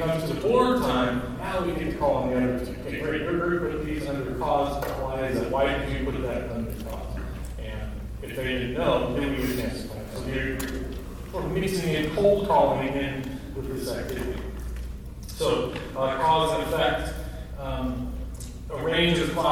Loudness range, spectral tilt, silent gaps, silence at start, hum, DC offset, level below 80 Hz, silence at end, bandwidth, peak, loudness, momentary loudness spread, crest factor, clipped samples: 4 LU; -5.5 dB/octave; none; 0 s; none; 0.1%; -38 dBFS; 0 s; 19.5 kHz; -8 dBFS; -27 LUFS; 14 LU; 18 dB; under 0.1%